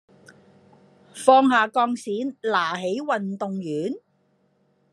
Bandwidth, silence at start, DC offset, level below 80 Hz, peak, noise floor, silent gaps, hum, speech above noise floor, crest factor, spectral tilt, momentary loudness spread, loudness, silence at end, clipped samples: 12.5 kHz; 1.15 s; under 0.1%; -82 dBFS; -2 dBFS; -66 dBFS; none; none; 44 dB; 22 dB; -5 dB/octave; 13 LU; -22 LUFS; 0.95 s; under 0.1%